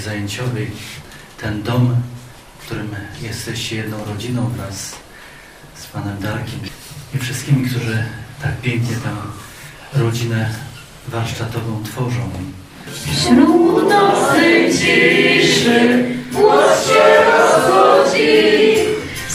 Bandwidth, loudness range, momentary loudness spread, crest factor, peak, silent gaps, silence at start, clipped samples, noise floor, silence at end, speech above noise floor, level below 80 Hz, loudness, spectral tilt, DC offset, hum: 16 kHz; 14 LU; 19 LU; 16 dB; 0 dBFS; none; 0 s; under 0.1%; -39 dBFS; 0 s; 23 dB; -46 dBFS; -15 LUFS; -5 dB/octave; under 0.1%; none